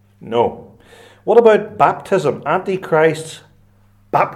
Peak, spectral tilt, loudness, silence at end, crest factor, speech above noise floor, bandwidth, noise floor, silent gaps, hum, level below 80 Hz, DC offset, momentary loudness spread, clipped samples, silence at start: 0 dBFS; -6 dB/octave; -16 LUFS; 0 s; 16 dB; 36 dB; 12.5 kHz; -51 dBFS; none; none; -58 dBFS; under 0.1%; 11 LU; under 0.1%; 0.2 s